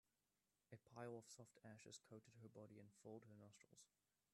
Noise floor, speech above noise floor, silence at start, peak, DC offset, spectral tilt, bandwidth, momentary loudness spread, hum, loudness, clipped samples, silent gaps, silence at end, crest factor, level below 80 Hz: under -90 dBFS; over 27 dB; 0.7 s; -42 dBFS; under 0.1%; -5 dB/octave; 12.5 kHz; 11 LU; none; -63 LUFS; under 0.1%; none; 0.45 s; 20 dB; under -90 dBFS